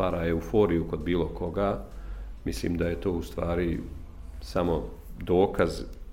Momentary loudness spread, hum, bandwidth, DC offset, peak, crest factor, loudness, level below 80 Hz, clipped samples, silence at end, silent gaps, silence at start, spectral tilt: 18 LU; none; 16 kHz; under 0.1%; -10 dBFS; 18 dB; -29 LUFS; -40 dBFS; under 0.1%; 0 s; none; 0 s; -7 dB/octave